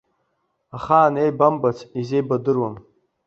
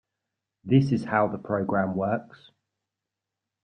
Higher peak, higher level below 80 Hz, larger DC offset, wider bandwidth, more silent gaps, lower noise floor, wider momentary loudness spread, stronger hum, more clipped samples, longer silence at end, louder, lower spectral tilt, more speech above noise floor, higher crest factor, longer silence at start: first, -2 dBFS vs -8 dBFS; first, -58 dBFS vs -64 dBFS; neither; second, 7.6 kHz vs 9 kHz; neither; second, -71 dBFS vs -87 dBFS; first, 13 LU vs 8 LU; neither; neither; second, 0.45 s vs 1.3 s; first, -20 LUFS vs -25 LUFS; about the same, -8.5 dB/octave vs -9 dB/octave; second, 52 dB vs 62 dB; about the same, 20 dB vs 20 dB; about the same, 0.75 s vs 0.65 s